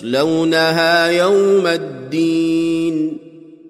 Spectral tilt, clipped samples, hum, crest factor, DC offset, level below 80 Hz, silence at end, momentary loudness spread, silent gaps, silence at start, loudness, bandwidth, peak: -5 dB/octave; under 0.1%; none; 12 dB; under 0.1%; -62 dBFS; 0 s; 9 LU; none; 0 s; -15 LUFS; 15 kHz; -4 dBFS